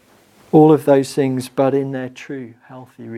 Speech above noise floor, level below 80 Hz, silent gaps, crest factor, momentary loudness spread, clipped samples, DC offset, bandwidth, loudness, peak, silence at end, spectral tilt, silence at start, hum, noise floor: 34 dB; -64 dBFS; none; 16 dB; 20 LU; under 0.1%; under 0.1%; 14.5 kHz; -15 LUFS; 0 dBFS; 0 s; -7.5 dB/octave; 0.55 s; none; -51 dBFS